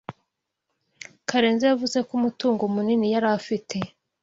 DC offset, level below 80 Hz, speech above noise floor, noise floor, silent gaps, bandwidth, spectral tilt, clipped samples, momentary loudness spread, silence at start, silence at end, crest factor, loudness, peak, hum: under 0.1%; -66 dBFS; 57 dB; -80 dBFS; none; 7.8 kHz; -5 dB/octave; under 0.1%; 15 LU; 0.1 s; 0.35 s; 20 dB; -23 LUFS; -4 dBFS; none